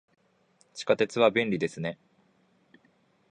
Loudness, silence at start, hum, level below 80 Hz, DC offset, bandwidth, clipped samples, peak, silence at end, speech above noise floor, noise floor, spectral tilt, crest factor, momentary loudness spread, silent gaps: -27 LUFS; 0.75 s; none; -70 dBFS; under 0.1%; 10.5 kHz; under 0.1%; -8 dBFS; 1.35 s; 40 dB; -67 dBFS; -5 dB/octave; 22 dB; 19 LU; none